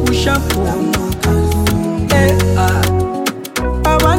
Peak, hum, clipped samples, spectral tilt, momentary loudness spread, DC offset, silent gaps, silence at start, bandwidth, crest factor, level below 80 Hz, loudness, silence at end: 0 dBFS; none; under 0.1%; -5.5 dB/octave; 6 LU; under 0.1%; none; 0 s; 17 kHz; 12 dB; -24 dBFS; -15 LUFS; 0 s